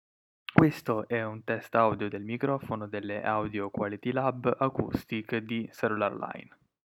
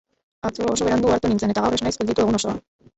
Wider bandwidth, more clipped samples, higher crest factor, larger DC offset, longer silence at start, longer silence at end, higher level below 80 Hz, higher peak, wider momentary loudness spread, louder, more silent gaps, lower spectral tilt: first, 16.5 kHz vs 8.4 kHz; neither; first, 26 dB vs 16 dB; neither; about the same, 0.55 s vs 0.45 s; about the same, 0.45 s vs 0.35 s; second, -62 dBFS vs -44 dBFS; about the same, -4 dBFS vs -6 dBFS; about the same, 9 LU vs 10 LU; second, -30 LUFS vs -21 LUFS; neither; first, -8 dB/octave vs -5 dB/octave